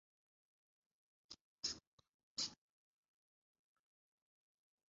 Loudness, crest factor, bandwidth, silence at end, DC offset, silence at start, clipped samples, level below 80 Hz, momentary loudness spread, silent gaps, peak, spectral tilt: -46 LUFS; 26 dB; 7.4 kHz; 2.35 s; under 0.1%; 1.3 s; under 0.1%; -84 dBFS; 16 LU; 1.41-1.63 s, 1.87-1.98 s, 2.14-2.36 s; -30 dBFS; 0 dB/octave